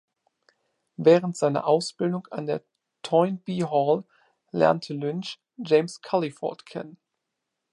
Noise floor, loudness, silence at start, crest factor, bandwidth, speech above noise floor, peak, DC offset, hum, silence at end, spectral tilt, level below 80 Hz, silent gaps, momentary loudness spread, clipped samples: -82 dBFS; -25 LUFS; 1 s; 20 dB; 11 kHz; 58 dB; -4 dBFS; under 0.1%; none; 0.75 s; -6 dB/octave; -74 dBFS; none; 17 LU; under 0.1%